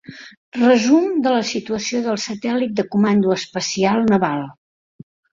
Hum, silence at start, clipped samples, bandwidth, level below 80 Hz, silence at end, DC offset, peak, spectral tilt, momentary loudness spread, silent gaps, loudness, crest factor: none; 0.1 s; under 0.1%; 7.6 kHz; -58 dBFS; 0.9 s; under 0.1%; -2 dBFS; -5 dB/octave; 8 LU; 0.37-0.52 s; -18 LUFS; 16 dB